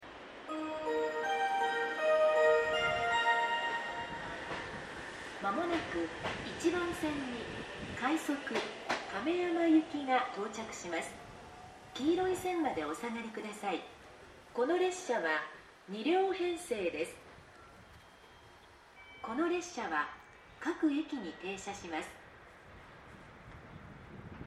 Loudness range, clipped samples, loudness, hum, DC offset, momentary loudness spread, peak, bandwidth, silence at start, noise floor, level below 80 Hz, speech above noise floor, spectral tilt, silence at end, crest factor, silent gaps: 9 LU; under 0.1%; -35 LUFS; none; under 0.1%; 23 LU; -18 dBFS; 13.5 kHz; 0 s; -58 dBFS; -64 dBFS; 24 dB; -4 dB/octave; 0 s; 18 dB; none